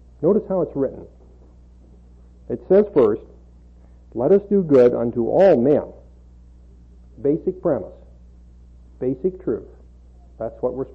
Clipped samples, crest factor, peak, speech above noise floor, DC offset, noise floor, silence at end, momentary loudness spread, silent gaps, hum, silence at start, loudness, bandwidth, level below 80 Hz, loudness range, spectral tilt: under 0.1%; 16 dB; -6 dBFS; 28 dB; under 0.1%; -47 dBFS; 0.05 s; 17 LU; none; 60 Hz at -45 dBFS; 0.2 s; -19 LUFS; 5.8 kHz; -46 dBFS; 10 LU; -10 dB/octave